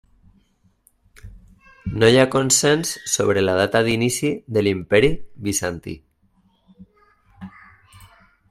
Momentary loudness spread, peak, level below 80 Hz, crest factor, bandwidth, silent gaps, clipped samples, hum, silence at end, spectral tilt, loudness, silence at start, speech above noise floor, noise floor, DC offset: 19 LU; 0 dBFS; -46 dBFS; 22 dB; 15.5 kHz; none; under 0.1%; none; 1 s; -4 dB/octave; -19 LUFS; 1.25 s; 42 dB; -61 dBFS; under 0.1%